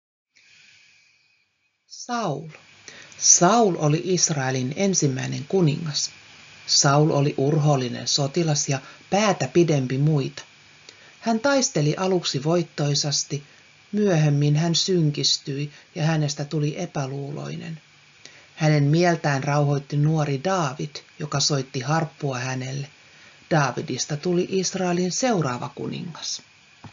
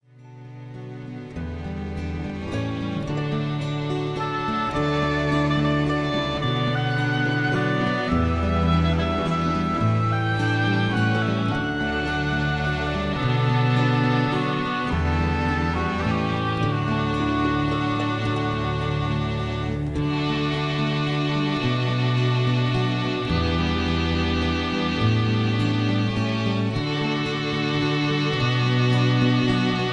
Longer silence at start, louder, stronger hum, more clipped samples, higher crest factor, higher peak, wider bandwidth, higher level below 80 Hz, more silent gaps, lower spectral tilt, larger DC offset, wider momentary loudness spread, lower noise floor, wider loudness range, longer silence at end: first, 1.9 s vs 0.2 s; about the same, -22 LUFS vs -23 LUFS; neither; neither; first, 22 dB vs 14 dB; first, -2 dBFS vs -8 dBFS; second, 7.6 kHz vs 9.8 kHz; second, -64 dBFS vs -38 dBFS; neither; second, -5 dB/octave vs -7 dB/octave; second, under 0.1% vs 0.1%; first, 13 LU vs 6 LU; first, -70 dBFS vs -43 dBFS; first, 5 LU vs 2 LU; about the same, 0.05 s vs 0 s